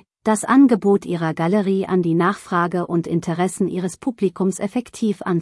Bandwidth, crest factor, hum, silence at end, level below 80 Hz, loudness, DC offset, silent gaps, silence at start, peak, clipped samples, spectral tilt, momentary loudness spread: 12 kHz; 14 dB; none; 0 s; -62 dBFS; -20 LUFS; under 0.1%; none; 0.25 s; -4 dBFS; under 0.1%; -6.5 dB/octave; 9 LU